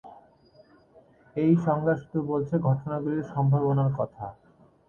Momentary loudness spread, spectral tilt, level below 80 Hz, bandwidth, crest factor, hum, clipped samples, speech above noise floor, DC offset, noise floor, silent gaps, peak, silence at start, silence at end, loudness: 10 LU; -11 dB/octave; -60 dBFS; 6.8 kHz; 16 dB; none; under 0.1%; 32 dB; under 0.1%; -57 dBFS; none; -10 dBFS; 0.05 s; 0.55 s; -26 LUFS